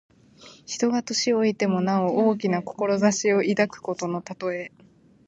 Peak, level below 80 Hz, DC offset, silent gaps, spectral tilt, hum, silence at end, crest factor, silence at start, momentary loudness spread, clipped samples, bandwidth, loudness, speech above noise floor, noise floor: -6 dBFS; -68 dBFS; under 0.1%; none; -4.5 dB/octave; none; 0.6 s; 18 dB; 0.45 s; 9 LU; under 0.1%; 8.2 kHz; -24 LUFS; 27 dB; -50 dBFS